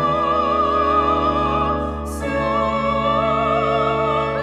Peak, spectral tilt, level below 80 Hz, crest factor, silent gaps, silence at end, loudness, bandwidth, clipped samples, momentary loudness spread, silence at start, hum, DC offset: -6 dBFS; -6.5 dB/octave; -34 dBFS; 12 dB; none; 0 s; -19 LUFS; 13.5 kHz; under 0.1%; 5 LU; 0 s; none; under 0.1%